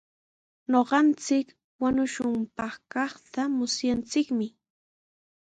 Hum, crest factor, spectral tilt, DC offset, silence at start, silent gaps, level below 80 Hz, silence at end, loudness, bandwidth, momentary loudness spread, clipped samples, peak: none; 20 dB; -3.5 dB/octave; under 0.1%; 0.7 s; 1.64-1.79 s; -62 dBFS; 1 s; -27 LUFS; 9.2 kHz; 11 LU; under 0.1%; -8 dBFS